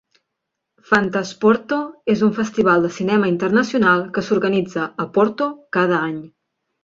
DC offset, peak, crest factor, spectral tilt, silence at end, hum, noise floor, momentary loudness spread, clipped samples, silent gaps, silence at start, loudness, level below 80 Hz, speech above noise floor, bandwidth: under 0.1%; 0 dBFS; 18 dB; -6 dB/octave; 0.55 s; none; -79 dBFS; 7 LU; under 0.1%; none; 0.9 s; -18 LUFS; -60 dBFS; 61 dB; 7.6 kHz